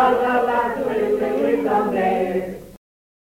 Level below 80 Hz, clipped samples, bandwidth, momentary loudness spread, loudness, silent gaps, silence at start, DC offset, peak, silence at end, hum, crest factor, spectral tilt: -50 dBFS; under 0.1%; 16.5 kHz; 7 LU; -20 LUFS; none; 0 s; under 0.1%; -6 dBFS; 0.55 s; none; 14 dB; -6.5 dB/octave